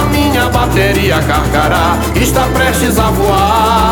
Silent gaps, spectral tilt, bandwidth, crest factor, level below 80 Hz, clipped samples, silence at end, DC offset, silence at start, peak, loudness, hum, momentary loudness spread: none; -5 dB/octave; 19 kHz; 10 dB; -20 dBFS; under 0.1%; 0 s; under 0.1%; 0 s; 0 dBFS; -11 LUFS; none; 2 LU